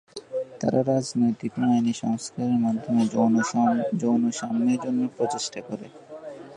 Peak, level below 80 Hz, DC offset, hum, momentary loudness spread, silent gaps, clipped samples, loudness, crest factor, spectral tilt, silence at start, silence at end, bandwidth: -8 dBFS; -68 dBFS; under 0.1%; none; 14 LU; none; under 0.1%; -24 LUFS; 16 dB; -6 dB/octave; 0.15 s; 0 s; 10.5 kHz